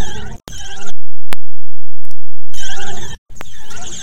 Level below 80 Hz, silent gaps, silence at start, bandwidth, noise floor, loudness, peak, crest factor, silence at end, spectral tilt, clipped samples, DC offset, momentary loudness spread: -36 dBFS; 3.18-3.26 s; 0 s; 17.5 kHz; -25 dBFS; -31 LUFS; 0 dBFS; 2 dB; 0 s; -3.5 dB/octave; 40%; under 0.1%; 21 LU